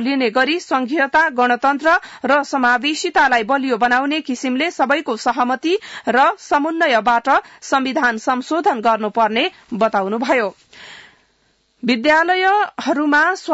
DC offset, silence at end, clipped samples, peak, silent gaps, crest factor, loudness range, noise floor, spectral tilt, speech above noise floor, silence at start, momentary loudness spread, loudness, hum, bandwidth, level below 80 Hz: under 0.1%; 0 s; under 0.1%; -4 dBFS; none; 12 dB; 3 LU; -61 dBFS; -3.5 dB/octave; 44 dB; 0 s; 6 LU; -17 LUFS; none; 8 kHz; -58 dBFS